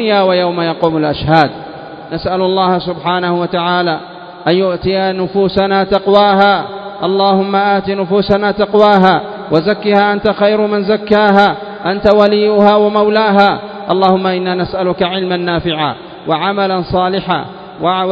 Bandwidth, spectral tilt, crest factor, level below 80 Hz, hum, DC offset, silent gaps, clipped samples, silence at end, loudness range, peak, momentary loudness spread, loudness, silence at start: 8 kHz; -8 dB/octave; 12 dB; -42 dBFS; none; under 0.1%; none; 0.2%; 0 s; 4 LU; 0 dBFS; 9 LU; -12 LUFS; 0 s